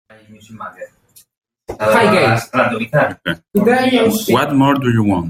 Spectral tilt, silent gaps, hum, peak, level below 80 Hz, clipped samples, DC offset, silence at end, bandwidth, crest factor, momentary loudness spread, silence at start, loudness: -6 dB/octave; none; none; -2 dBFS; -50 dBFS; under 0.1%; under 0.1%; 0 s; 16.5 kHz; 14 dB; 19 LU; 0.5 s; -14 LUFS